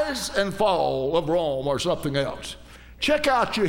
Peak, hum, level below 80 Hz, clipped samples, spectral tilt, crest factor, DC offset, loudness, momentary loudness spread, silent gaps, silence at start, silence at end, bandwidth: -8 dBFS; none; -46 dBFS; under 0.1%; -4.5 dB/octave; 16 dB; under 0.1%; -24 LUFS; 9 LU; none; 0 s; 0 s; 17.5 kHz